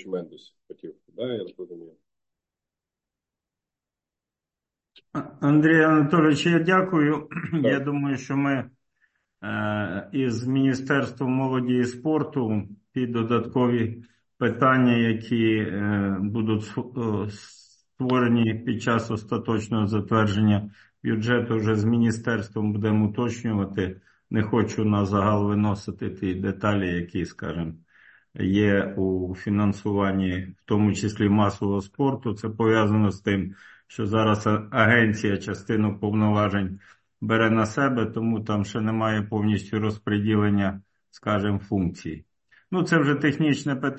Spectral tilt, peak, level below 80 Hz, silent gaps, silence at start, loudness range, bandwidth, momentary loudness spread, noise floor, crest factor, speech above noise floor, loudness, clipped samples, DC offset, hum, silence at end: -7 dB/octave; -4 dBFS; -50 dBFS; none; 0.05 s; 5 LU; 8.4 kHz; 12 LU; -89 dBFS; 20 dB; 65 dB; -24 LUFS; under 0.1%; under 0.1%; none; 0 s